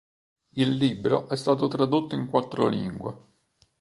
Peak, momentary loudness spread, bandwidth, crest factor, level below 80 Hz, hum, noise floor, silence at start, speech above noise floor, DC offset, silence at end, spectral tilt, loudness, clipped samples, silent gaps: -6 dBFS; 10 LU; 11.5 kHz; 20 dB; -62 dBFS; none; -66 dBFS; 0.55 s; 41 dB; under 0.1%; 0.6 s; -7 dB/octave; -25 LUFS; under 0.1%; none